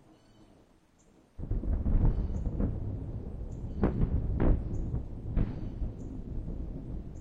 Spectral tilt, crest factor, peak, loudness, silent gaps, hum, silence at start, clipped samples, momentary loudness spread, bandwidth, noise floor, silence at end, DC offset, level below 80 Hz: -10.5 dB/octave; 20 dB; -12 dBFS; -35 LUFS; none; none; 0.4 s; under 0.1%; 11 LU; 3.4 kHz; -63 dBFS; 0 s; under 0.1%; -34 dBFS